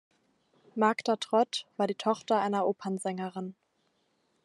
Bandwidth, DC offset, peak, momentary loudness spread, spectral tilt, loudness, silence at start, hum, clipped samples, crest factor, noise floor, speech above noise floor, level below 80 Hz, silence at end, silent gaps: 12 kHz; under 0.1%; -10 dBFS; 10 LU; -5 dB/octave; -30 LUFS; 0.75 s; none; under 0.1%; 20 dB; -74 dBFS; 44 dB; -86 dBFS; 0.95 s; none